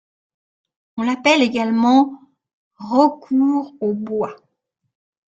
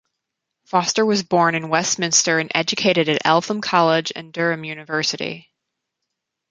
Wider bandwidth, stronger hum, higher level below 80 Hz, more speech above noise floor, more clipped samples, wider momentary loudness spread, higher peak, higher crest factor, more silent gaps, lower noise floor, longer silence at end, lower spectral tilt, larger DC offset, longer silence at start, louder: second, 8 kHz vs 11 kHz; neither; about the same, -66 dBFS vs -66 dBFS; second, 55 dB vs 61 dB; neither; about the same, 10 LU vs 9 LU; about the same, -2 dBFS vs -2 dBFS; about the same, 18 dB vs 20 dB; first, 2.53-2.71 s vs none; second, -73 dBFS vs -80 dBFS; about the same, 1 s vs 1.1 s; first, -5 dB/octave vs -3 dB/octave; neither; first, 0.95 s vs 0.75 s; about the same, -18 LUFS vs -19 LUFS